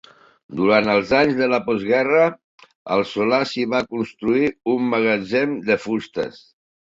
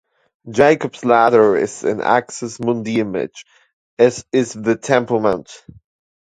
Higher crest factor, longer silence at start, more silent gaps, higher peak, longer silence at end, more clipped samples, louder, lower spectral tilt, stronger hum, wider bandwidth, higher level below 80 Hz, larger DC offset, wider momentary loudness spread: about the same, 18 dB vs 18 dB; about the same, 0.5 s vs 0.45 s; about the same, 2.44-2.58 s, 2.75-2.85 s vs 3.73-3.97 s; about the same, -2 dBFS vs 0 dBFS; second, 0.6 s vs 0.75 s; neither; second, -20 LUFS vs -17 LUFS; about the same, -6 dB/octave vs -5.5 dB/octave; neither; second, 7.8 kHz vs 9.4 kHz; about the same, -56 dBFS vs -56 dBFS; neither; second, 8 LU vs 11 LU